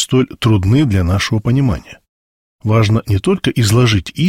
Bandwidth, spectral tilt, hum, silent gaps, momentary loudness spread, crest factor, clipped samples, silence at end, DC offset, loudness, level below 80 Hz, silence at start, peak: 15.5 kHz; -6 dB/octave; none; 2.09-2.59 s; 4 LU; 12 dB; under 0.1%; 0 s; under 0.1%; -14 LUFS; -34 dBFS; 0 s; -2 dBFS